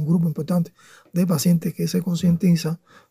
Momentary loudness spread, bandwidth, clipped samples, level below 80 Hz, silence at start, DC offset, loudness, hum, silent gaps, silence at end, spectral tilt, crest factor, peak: 10 LU; 16 kHz; under 0.1%; -60 dBFS; 0 s; under 0.1%; -22 LUFS; none; none; 0.35 s; -7 dB/octave; 14 dB; -8 dBFS